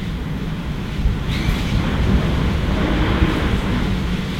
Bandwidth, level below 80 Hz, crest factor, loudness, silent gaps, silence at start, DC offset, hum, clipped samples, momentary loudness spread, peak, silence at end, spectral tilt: 15.5 kHz; -22 dBFS; 14 dB; -20 LUFS; none; 0 s; under 0.1%; none; under 0.1%; 7 LU; -6 dBFS; 0 s; -6.5 dB/octave